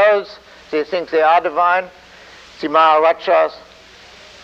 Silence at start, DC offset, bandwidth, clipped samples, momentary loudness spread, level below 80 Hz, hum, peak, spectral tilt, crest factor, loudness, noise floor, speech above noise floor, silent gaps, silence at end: 0 s; under 0.1%; 7.6 kHz; under 0.1%; 12 LU; -58 dBFS; none; -2 dBFS; -4 dB/octave; 14 dB; -15 LUFS; -42 dBFS; 27 dB; none; 0.85 s